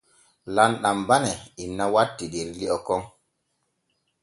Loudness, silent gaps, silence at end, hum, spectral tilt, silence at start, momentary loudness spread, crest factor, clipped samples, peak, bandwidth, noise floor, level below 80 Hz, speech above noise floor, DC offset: -24 LUFS; none; 1.15 s; none; -4 dB/octave; 0.45 s; 11 LU; 24 dB; under 0.1%; -2 dBFS; 11.5 kHz; -75 dBFS; -56 dBFS; 51 dB; under 0.1%